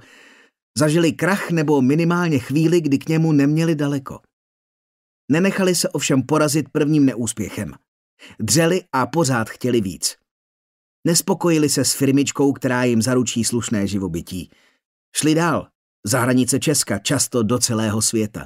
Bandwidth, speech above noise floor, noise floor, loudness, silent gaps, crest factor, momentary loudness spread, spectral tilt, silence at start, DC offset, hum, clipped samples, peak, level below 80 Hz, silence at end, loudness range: 16 kHz; 31 dB; -50 dBFS; -19 LUFS; 4.33-5.28 s, 7.88-8.17 s, 10.31-11.03 s, 14.85-15.12 s, 15.75-16.03 s; 16 dB; 9 LU; -4.5 dB/octave; 0.75 s; under 0.1%; none; under 0.1%; -2 dBFS; -56 dBFS; 0 s; 3 LU